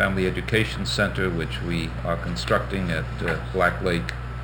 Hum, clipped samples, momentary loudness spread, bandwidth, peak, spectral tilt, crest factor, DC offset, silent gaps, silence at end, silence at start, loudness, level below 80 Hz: none; under 0.1%; 5 LU; over 20 kHz; -6 dBFS; -5.5 dB/octave; 18 dB; under 0.1%; none; 0 s; 0 s; -25 LUFS; -34 dBFS